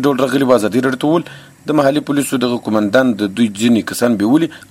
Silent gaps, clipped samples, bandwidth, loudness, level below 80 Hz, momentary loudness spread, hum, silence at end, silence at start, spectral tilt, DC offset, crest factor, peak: none; under 0.1%; 16 kHz; -15 LUFS; -56 dBFS; 4 LU; none; 0.1 s; 0 s; -5.5 dB/octave; under 0.1%; 14 dB; 0 dBFS